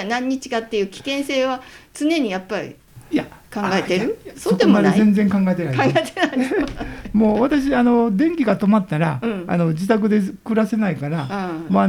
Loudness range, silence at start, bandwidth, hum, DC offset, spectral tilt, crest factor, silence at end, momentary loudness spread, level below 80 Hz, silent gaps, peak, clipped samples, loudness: 5 LU; 0 s; 14.5 kHz; none; under 0.1%; -6.5 dB/octave; 16 dB; 0 s; 10 LU; -46 dBFS; none; -2 dBFS; under 0.1%; -19 LUFS